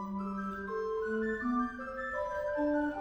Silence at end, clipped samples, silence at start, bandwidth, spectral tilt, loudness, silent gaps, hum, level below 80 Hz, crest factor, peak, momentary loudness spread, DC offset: 0 s; under 0.1%; 0 s; over 20 kHz; -7.5 dB/octave; -35 LUFS; none; none; -58 dBFS; 12 dB; -22 dBFS; 6 LU; under 0.1%